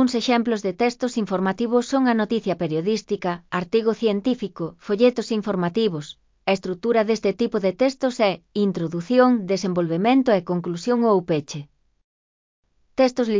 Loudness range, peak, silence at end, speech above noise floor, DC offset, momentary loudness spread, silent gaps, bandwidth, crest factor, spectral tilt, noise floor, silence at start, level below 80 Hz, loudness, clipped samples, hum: 2 LU; -4 dBFS; 0 s; over 69 dB; under 0.1%; 8 LU; 12.04-12.63 s; 7.6 kHz; 18 dB; -6 dB/octave; under -90 dBFS; 0 s; -62 dBFS; -22 LUFS; under 0.1%; none